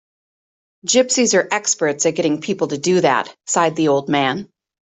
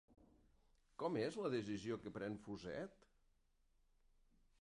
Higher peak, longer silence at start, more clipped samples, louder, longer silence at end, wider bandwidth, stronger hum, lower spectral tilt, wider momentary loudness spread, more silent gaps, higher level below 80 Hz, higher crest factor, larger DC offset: first, -2 dBFS vs -30 dBFS; first, 0.85 s vs 0.1 s; neither; first, -17 LUFS vs -46 LUFS; second, 0.35 s vs 1.7 s; second, 8.4 kHz vs 11 kHz; neither; second, -3 dB/octave vs -6 dB/octave; second, 6 LU vs 9 LU; neither; first, -64 dBFS vs -74 dBFS; about the same, 16 dB vs 18 dB; neither